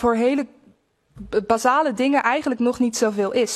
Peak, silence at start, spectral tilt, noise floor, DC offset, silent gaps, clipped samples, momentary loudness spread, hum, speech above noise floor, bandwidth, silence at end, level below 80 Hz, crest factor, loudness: -4 dBFS; 0 s; -4 dB/octave; -58 dBFS; under 0.1%; none; under 0.1%; 7 LU; none; 38 dB; 13 kHz; 0 s; -52 dBFS; 16 dB; -20 LUFS